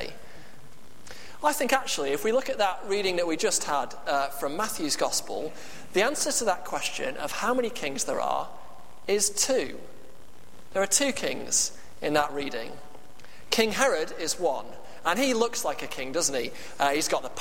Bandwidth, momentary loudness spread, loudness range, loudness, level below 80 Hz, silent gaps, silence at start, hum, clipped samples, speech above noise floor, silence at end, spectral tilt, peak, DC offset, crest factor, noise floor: 16.5 kHz; 12 LU; 2 LU; -27 LUFS; -60 dBFS; none; 0 s; none; under 0.1%; 25 dB; 0 s; -1.5 dB/octave; -6 dBFS; 2%; 22 dB; -53 dBFS